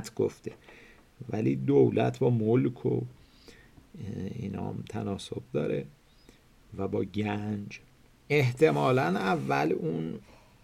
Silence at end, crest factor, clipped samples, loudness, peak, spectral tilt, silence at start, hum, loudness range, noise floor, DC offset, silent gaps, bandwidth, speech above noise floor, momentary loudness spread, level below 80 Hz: 0.45 s; 20 dB; under 0.1%; -29 LUFS; -10 dBFS; -7.5 dB/octave; 0 s; none; 8 LU; -58 dBFS; under 0.1%; none; 13.5 kHz; 29 dB; 20 LU; -62 dBFS